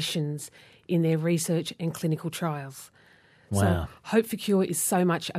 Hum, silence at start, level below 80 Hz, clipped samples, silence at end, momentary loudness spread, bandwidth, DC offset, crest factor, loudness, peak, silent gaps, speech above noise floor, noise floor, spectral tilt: none; 0 s; -56 dBFS; under 0.1%; 0 s; 11 LU; 15.5 kHz; under 0.1%; 18 dB; -27 LUFS; -10 dBFS; none; 31 dB; -58 dBFS; -5 dB/octave